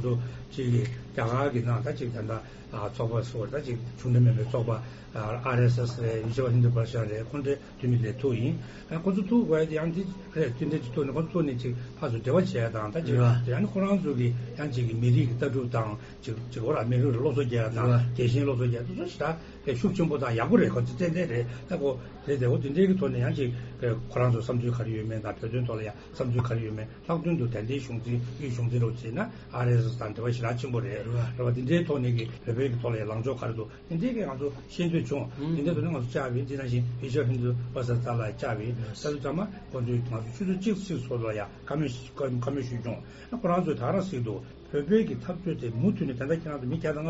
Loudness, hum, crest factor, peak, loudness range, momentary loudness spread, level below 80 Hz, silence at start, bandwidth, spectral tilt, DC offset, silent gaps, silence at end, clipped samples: -29 LUFS; none; 20 dB; -8 dBFS; 4 LU; 9 LU; -52 dBFS; 0 s; 7.6 kHz; -7.5 dB/octave; under 0.1%; none; 0 s; under 0.1%